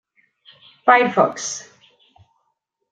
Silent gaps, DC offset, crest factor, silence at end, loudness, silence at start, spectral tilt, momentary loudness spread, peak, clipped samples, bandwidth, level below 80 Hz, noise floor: none; under 0.1%; 20 dB; 1.3 s; -17 LUFS; 0.85 s; -3 dB/octave; 14 LU; -2 dBFS; under 0.1%; 9.4 kHz; -74 dBFS; -73 dBFS